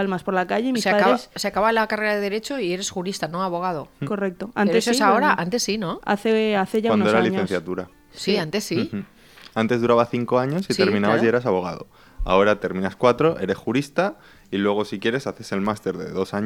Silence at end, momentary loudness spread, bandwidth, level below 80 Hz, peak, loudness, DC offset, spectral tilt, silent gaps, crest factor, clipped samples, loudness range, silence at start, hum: 0 s; 9 LU; 16 kHz; -46 dBFS; -2 dBFS; -22 LUFS; under 0.1%; -5 dB/octave; none; 20 dB; under 0.1%; 3 LU; 0 s; none